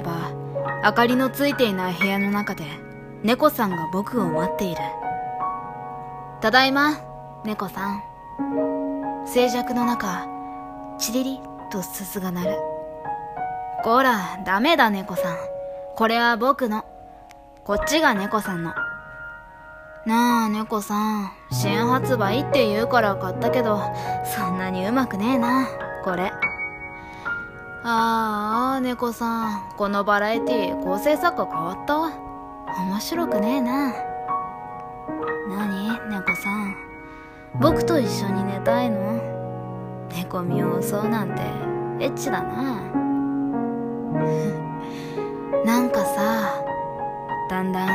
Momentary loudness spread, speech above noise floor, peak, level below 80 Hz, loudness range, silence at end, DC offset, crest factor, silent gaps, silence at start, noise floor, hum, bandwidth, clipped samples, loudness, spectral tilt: 14 LU; 23 dB; -2 dBFS; -50 dBFS; 4 LU; 0 s; under 0.1%; 22 dB; none; 0 s; -45 dBFS; none; 15.5 kHz; under 0.1%; -23 LUFS; -5 dB/octave